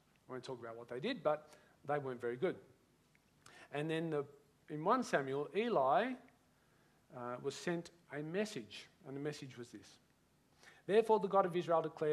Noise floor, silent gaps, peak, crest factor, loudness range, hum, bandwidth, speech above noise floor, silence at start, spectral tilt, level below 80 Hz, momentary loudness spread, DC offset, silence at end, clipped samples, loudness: -73 dBFS; none; -18 dBFS; 20 dB; 7 LU; none; 13.5 kHz; 35 dB; 0.3 s; -6 dB/octave; -84 dBFS; 19 LU; under 0.1%; 0 s; under 0.1%; -38 LUFS